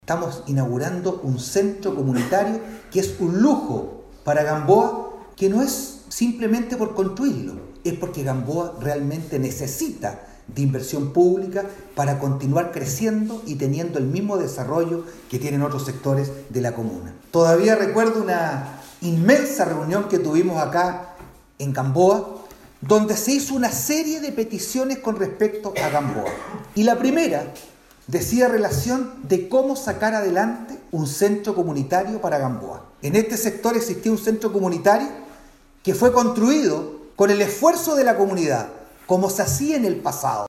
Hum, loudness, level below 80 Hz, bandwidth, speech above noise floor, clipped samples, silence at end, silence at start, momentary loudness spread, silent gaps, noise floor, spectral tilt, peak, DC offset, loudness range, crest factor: none; -21 LUFS; -52 dBFS; 16 kHz; 28 dB; under 0.1%; 0 s; 0.1 s; 12 LU; none; -49 dBFS; -5.5 dB/octave; -4 dBFS; under 0.1%; 5 LU; 18 dB